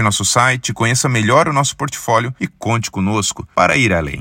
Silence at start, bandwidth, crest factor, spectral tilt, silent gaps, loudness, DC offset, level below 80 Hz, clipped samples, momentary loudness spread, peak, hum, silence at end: 0 s; 16.5 kHz; 16 dB; -4 dB/octave; none; -15 LUFS; under 0.1%; -44 dBFS; under 0.1%; 6 LU; 0 dBFS; none; 0 s